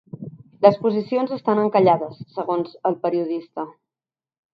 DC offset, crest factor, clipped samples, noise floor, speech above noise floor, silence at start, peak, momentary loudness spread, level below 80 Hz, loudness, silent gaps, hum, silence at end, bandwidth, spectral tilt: under 0.1%; 22 dB; under 0.1%; under -90 dBFS; over 70 dB; 0.15 s; 0 dBFS; 17 LU; -70 dBFS; -21 LUFS; none; none; 0.85 s; 5.8 kHz; -9.5 dB/octave